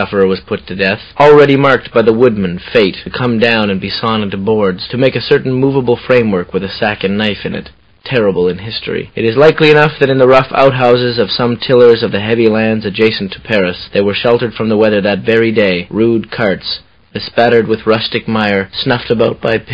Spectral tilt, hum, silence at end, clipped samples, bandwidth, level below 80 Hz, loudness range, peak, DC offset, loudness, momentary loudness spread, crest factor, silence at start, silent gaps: -7.5 dB/octave; none; 0 s; 0.6%; 8 kHz; -42 dBFS; 4 LU; 0 dBFS; under 0.1%; -11 LUFS; 10 LU; 12 dB; 0 s; none